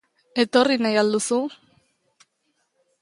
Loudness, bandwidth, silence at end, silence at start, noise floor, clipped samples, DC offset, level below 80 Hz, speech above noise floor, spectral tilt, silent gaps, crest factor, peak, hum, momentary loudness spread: -21 LUFS; 11.5 kHz; 1.5 s; 0.35 s; -72 dBFS; under 0.1%; under 0.1%; -72 dBFS; 52 dB; -3.5 dB/octave; none; 20 dB; -4 dBFS; none; 10 LU